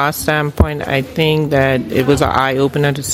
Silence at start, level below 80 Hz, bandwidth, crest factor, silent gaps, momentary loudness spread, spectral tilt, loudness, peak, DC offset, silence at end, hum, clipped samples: 0 s; -28 dBFS; 16.5 kHz; 14 dB; none; 3 LU; -5 dB/octave; -15 LUFS; 0 dBFS; under 0.1%; 0 s; none; under 0.1%